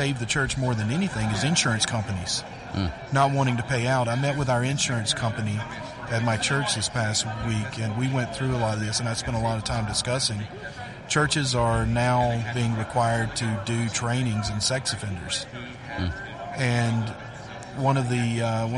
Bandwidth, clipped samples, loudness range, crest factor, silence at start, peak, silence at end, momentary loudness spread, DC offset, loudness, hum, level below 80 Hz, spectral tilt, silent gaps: 11.5 kHz; under 0.1%; 3 LU; 18 dB; 0 s; -6 dBFS; 0 s; 9 LU; under 0.1%; -25 LUFS; none; -44 dBFS; -4.5 dB/octave; none